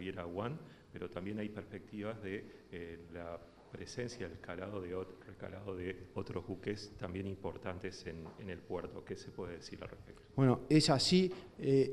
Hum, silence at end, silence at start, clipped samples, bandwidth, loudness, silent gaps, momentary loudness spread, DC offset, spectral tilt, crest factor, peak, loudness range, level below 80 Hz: none; 0 s; 0 s; under 0.1%; 13 kHz; -39 LUFS; none; 19 LU; under 0.1%; -5.5 dB/octave; 24 dB; -16 dBFS; 11 LU; -64 dBFS